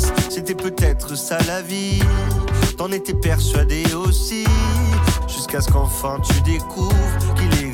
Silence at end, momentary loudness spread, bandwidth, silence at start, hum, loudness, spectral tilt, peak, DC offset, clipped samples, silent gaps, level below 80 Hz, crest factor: 0 s; 5 LU; 17.5 kHz; 0 s; none; -19 LUFS; -5 dB/octave; -6 dBFS; under 0.1%; under 0.1%; none; -22 dBFS; 12 dB